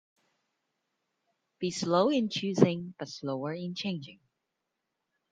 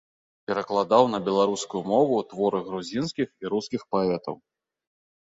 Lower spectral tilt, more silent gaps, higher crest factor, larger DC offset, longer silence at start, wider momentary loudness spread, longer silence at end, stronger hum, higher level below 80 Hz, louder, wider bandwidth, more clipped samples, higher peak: about the same, -6 dB/octave vs -5.5 dB/octave; neither; first, 28 dB vs 22 dB; neither; first, 1.6 s vs 0.5 s; first, 13 LU vs 10 LU; first, 1.15 s vs 0.95 s; neither; second, -76 dBFS vs -66 dBFS; second, -30 LUFS vs -25 LUFS; first, 9.4 kHz vs 8 kHz; neither; about the same, -6 dBFS vs -4 dBFS